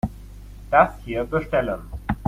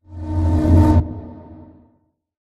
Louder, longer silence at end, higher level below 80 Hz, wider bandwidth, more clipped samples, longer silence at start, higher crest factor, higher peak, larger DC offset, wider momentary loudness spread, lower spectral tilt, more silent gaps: second, -23 LUFS vs -16 LUFS; second, 0 s vs 1 s; second, -38 dBFS vs -26 dBFS; first, 15.5 kHz vs 5.4 kHz; neither; about the same, 0.05 s vs 0.1 s; about the same, 20 dB vs 16 dB; about the same, -2 dBFS vs -2 dBFS; neither; first, 25 LU vs 20 LU; second, -7.5 dB/octave vs -9.5 dB/octave; neither